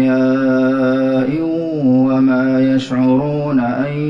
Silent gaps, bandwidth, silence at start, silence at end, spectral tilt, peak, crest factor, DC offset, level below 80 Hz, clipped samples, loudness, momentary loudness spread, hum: none; 7.2 kHz; 0 s; 0 s; -8.5 dB/octave; -4 dBFS; 10 dB; under 0.1%; -52 dBFS; under 0.1%; -15 LUFS; 4 LU; none